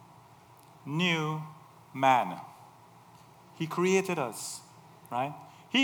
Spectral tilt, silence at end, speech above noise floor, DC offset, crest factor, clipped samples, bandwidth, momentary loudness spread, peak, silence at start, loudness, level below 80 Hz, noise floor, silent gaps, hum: -4.5 dB/octave; 0 s; 26 dB; under 0.1%; 20 dB; under 0.1%; over 20 kHz; 20 LU; -12 dBFS; 0 s; -30 LUFS; -82 dBFS; -56 dBFS; none; none